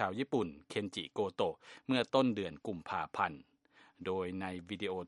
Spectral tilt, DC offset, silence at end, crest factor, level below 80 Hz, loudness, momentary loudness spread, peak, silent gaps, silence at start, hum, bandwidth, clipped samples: -6 dB/octave; under 0.1%; 0 s; 22 dB; -74 dBFS; -37 LUFS; 10 LU; -14 dBFS; none; 0 s; none; 11.5 kHz; under 0.1%